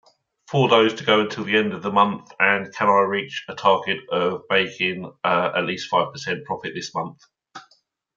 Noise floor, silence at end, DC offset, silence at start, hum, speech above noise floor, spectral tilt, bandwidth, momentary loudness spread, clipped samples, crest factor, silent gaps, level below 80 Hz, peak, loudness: -63 dBFS; 0.55 s; under 0.1%; 0.5 s; none; 41 dB; -5 dB/octave; 7.6 kHz; 11 LU; under 0.1%; 20 dB; none; -70 dBFS; -2 dBFS; -21 LUFS